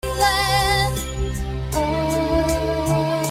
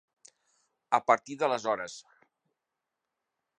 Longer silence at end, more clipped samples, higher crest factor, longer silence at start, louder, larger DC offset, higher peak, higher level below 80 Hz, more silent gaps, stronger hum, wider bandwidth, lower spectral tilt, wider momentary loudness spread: second, 0 s vs 1.6 s; neither; second, 16 dB vs 26 dB; second, 0.05 s vs 0.9 s; first, -20 LUFS vs -29 LUFS; neither; first, -4 dBFS vs -8 dBFS; first, -30 dBFS vs -84 dBFS; neither; neither; first, 16 kHz vs 10 kHz; about the same, -4.5 dB/octave vs -3.5 dB/octave; second, 8 LU vs 14 LU